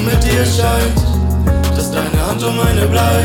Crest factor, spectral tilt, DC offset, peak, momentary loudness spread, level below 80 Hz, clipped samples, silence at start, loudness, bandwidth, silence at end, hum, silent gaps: 12 dB; -5.5 dB/octave; under 0.1%; -2 dBFS; 3 LU; -20 dBFS; under 0.1%; 0 s; -14 LUFS; 18.5 kHz; 0 s; none; none